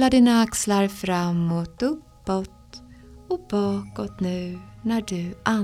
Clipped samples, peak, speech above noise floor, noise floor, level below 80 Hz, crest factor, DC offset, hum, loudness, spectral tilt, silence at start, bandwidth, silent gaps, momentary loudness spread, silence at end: under 0.1%; -4 dBFS; 23 dB; -46 dBFS; -48 dBFS; 20 dB; under 0.1%; none; -24 LUFS; -5.5 dB/octave; 0 s; 15.5 kHz; none; 14 LU; 0 s